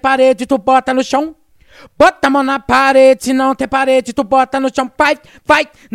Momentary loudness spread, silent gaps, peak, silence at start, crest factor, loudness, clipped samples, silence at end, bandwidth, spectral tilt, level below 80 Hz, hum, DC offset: 7 LU; none; 0 dBFS; 0.05 s; 12 dB; -12 LUFS; 0.1%; 0.3 s; 13.5 kHz; -3.5 dB/octave; -44 dBFS; none; under 0.1%